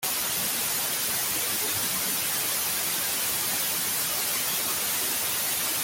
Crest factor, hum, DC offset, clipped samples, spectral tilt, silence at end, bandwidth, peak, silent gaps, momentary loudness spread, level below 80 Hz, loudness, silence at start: 14 dB; none; under 0.1%; under 0.1%; 0 dB/octave; 0 s; 17 kHz; -14 dBFS; none; 0 LU; -62 dBFS; -25 LUFS; 0 s